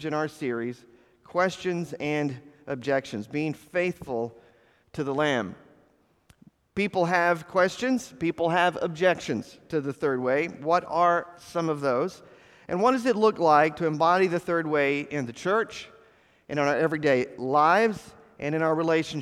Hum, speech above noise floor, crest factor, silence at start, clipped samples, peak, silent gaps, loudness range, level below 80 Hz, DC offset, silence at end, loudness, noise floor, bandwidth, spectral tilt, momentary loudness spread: none; 38 dB; 20 dB; 0 s; under 0.1%; -6 dBFS; none; 7 LU; -64 dBFS; under 0.1%; 0 s; -26 LUFS; -64 dBFS; 14 kHz; -5.5 dB/octave; 11 LU